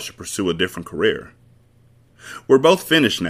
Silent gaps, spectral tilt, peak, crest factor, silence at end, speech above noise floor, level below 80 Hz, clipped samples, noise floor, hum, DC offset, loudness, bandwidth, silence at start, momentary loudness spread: none; -4 dB/octave; -2 dBFS; 18 dB; 0 s; 35 dB; -54 dBFS; under 0.1%; -54 dBFS; none; under 0.1%; -18 LUFS; 15.5 kHz; 0 s; 16 LU